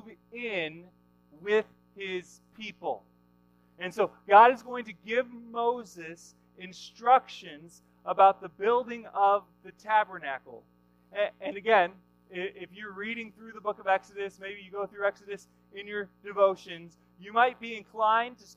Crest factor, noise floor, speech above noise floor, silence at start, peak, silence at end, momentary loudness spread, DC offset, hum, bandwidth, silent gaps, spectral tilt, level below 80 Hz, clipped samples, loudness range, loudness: 24 dB; -64 dBFS; 35 dB; 0.05 s; -6 dBFS; 0.2 s; 21 LU; under 0.1%; 60 Hz at -65 dBFS; 11.5 kHz; none; -4.5 dB/octave; -74 dBFS; under 0.1%; 8 LU; -28 LUFS